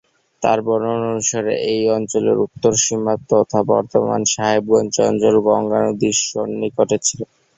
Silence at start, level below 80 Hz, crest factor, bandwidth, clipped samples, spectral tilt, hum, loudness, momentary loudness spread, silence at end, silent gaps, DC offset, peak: 0.4 s; -56 dBFS; 16 dB; 8.4 kHz; under 0.1%; -4 dB/octave; none; -17 LUFS; 5 LU; 0.35 s; none; under 0.1%; -2 dBFS